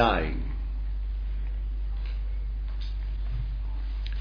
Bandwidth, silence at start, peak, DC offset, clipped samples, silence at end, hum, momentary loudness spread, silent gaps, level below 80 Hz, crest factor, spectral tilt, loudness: 5.2 kHz; 0 s; -8 dBFS; under 0.1%; under 0.1%; 0 s; none; 3 LU; none; -30 dBFS; 22 dB; -8 dB/octave; -33 LUFS